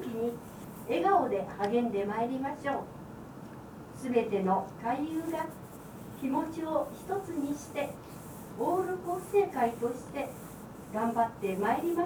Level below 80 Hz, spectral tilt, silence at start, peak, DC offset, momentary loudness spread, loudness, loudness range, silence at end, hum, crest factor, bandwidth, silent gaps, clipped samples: -62 dBFS; -6.5 dB/octave; 0 s; -14 dBFS; under 0.1%; 17 LU; -32 LUFS; 3 LU; 0 s; none; 20 dB; over 20 kHz; none; under 0.1%